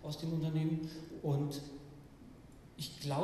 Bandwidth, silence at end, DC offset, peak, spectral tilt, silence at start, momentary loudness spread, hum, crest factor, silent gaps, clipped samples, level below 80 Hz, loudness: 14.5 kHz; 0 s; under 0.1%; -24 dBFS; -7 dB/octave; 0 s; 21 LU; none; 14 dB; none; under 0.1%; -64 dBFS; -39 LUFS